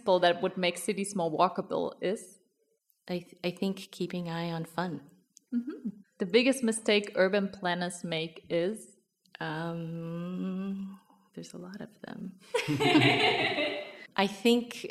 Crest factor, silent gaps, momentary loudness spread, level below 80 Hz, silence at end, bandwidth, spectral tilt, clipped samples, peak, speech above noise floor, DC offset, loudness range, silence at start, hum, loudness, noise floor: 20 dB; none; 18 LU; -74 dBFS; 0 s; 15 kHz; -4.5 dB/octave; under 0.1%; -10 dBFS; 44 dB; under 0.1%; 9 LU; 0.05 s; none; -30 LUFS; -74 dBFS